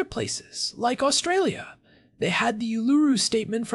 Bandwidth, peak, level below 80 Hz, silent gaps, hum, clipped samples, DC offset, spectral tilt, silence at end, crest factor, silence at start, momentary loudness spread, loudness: 12 kHz; -10 dBFS; -60 dBFS; none; none; under 0.1%; under 0.1%; -3.5 dB/octave; 0 s; 14 dB; 0 s; 9 LU; -24 LUFS